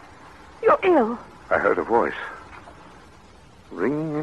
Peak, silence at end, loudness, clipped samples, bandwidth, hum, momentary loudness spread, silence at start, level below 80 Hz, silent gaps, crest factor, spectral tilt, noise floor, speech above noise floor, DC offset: -6 dBFS; 0 s; -22 LUFS; under 0.1%; 10.5 kHz; none; 22 LU; 0.25 s; -54 dBFS; none; 18 dB; -7 dB/octave; -49 dBFS; 28 dB; 0.2%